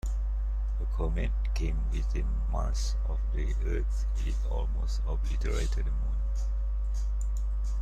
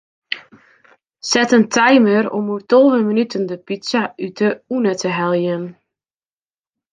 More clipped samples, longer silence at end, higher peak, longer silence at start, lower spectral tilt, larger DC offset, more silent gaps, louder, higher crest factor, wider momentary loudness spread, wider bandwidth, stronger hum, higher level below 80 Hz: neither; second, 0 s vs 1.2 s; second, -18 dBFS vs -2 dBFS; second, 0.05 s vs 0.3 s; first, -6 dB/octave vs -4.5 dB/octave; neither; neither; second, -33 LUFS vs -16 LUFS; second, 10 dB vs 16 dB; second, 2 LU vs 15 LU; second, 8.6 kHz vs 9.6 kHz; neither; first, -28 dBFS vs -66 dBFS